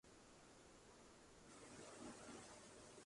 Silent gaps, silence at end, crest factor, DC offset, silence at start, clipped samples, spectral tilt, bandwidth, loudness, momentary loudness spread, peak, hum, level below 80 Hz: none; 0 s; 16 dB; under 0.1%; 0.05 s; under 0.1%; -3 dB/octave; 11.5 kHz; -61 LUFS; 8 LU; -46 dBFS; none; -78 dBFS